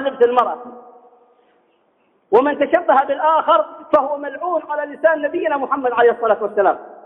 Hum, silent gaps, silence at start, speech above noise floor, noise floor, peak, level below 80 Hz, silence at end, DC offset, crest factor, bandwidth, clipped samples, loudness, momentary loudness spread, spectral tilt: none; none; 0 s; 44 dB; -61 dBFS; -2 dBFS; -66 dBFS; 0.1 s; under 0.1%; 16 dB; 4 kHz; under 0.1%; -17 LUFS; 8 LU; -6.5 dB/octave